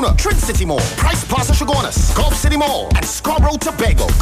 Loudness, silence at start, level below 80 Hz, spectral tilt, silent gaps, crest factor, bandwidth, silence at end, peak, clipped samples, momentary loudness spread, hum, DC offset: -16 LUFS; 0 s; -18 dBFS; -4.5 dB/octave; none; 12 dB; 16 kHz; 0 s; -2 dBFS; under 0.1%; 2 LU; none; under 0.1%